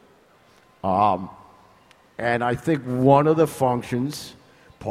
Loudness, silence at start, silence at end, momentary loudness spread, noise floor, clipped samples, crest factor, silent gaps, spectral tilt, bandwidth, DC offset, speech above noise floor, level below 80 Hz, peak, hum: -22 LUFS; 0.85 s; 0 s; 19 LU; -56 dBFS; under 0.1%; 20 dB; none; -7 dB/octave; 16 kHz; under 0.1%; 35 dB; -56 dBFS; -4 dBFS; none